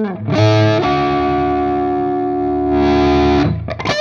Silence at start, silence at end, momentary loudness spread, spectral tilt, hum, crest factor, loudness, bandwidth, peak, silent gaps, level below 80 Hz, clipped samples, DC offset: 0 s; 0 s; 6 LU; -7 dB/octave; none; 12 dB; -15 LUFS; 7.2 kHz; -2 dBFS; none; -30 dBFS; under 0.1%; under 0.1%